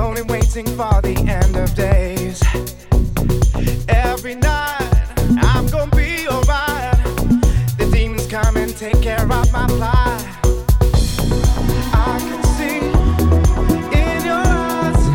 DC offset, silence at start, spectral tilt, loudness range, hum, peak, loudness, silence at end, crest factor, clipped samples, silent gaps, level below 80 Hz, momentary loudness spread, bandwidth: under 0.1%; 0 s; -6 dB/octave; 1 LU; none; -2 dBFS; -17 LUFS; 0 s; 14 dB; under 0.1%; none; -18 dBFS; 4 LU; 17.5 kHz